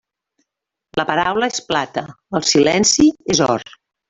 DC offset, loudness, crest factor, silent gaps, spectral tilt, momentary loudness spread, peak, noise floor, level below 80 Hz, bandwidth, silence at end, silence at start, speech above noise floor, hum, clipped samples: under 0.1%; -16 LUFS; 16 dB; none; -3 dB/octave; 12 LU; -2 dBFS; -82 dBFS; -50 dBFS; 8 kHz; 0.45 s; 0.95 s; 65 dB; none; under 0.1%